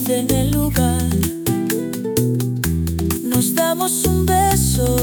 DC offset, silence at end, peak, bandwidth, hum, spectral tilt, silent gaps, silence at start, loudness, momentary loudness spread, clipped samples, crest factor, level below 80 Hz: under 0.1%; 0 s; -4 dBFS; 19.5 kHz; none; -5 dB/octave; none; 0 s; -18 LUFS; 5 LU; under 0.1%; 14 dB; -28 dBFS